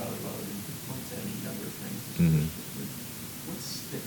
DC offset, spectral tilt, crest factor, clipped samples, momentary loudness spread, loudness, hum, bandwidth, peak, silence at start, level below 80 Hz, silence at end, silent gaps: under 0.1%; -5.5 dB/octave; 18 dB; under 0.1%; 12 LU; -33 LUFS; none; 19 kHz; -14 dBFS; 0 s; -54 dBFS; 0 s; none